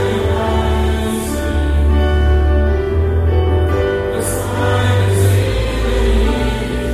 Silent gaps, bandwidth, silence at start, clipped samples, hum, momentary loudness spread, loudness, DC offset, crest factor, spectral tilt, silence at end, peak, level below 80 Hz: none; 14.5 kHz; 0 s; under 0.1%; none; 5 LU; -16 LUFS; under 0.1%; 10 dB; -6 dB/octave; 0 s; -4 dBFS; -18 dBFS